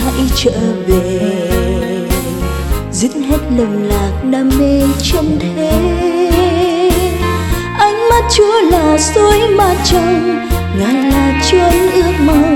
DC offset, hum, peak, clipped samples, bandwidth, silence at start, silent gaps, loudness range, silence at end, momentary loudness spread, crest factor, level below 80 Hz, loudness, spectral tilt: under 0.1%; none; 0 dBFS; under 0.1%; over 20 kHz; 0 s; none; 5 LU; 0 s; 7 LU; 12 dB; -20 dBFS; -12 LUFS; -5 dB/octave